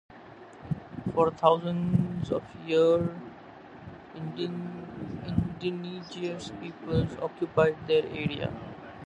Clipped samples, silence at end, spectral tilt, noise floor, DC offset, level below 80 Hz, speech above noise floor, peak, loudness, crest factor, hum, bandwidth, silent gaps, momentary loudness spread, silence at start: under 0.1%; 0 s; -7.5 dB/octave; -48 dBFS; under 0.1%; -52 dBFS; 20 dB; -6 dBFS; -29 LUFS; 24 dB; none; 8.6 kHz; none; 22 LU; 0.1 s